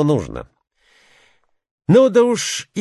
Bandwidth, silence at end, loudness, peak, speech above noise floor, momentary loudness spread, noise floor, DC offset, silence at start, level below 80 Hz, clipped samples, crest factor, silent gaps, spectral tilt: 12.5 kHz; 0 s; -15 LUFS; -2 dBFS; 43 dB; 19 LU; -59 dBFS; under 0.1%; 0 s; -48 dBFS; under 0.1%; 16 dB; 1.71-1.78 s; -5.5 dB/octave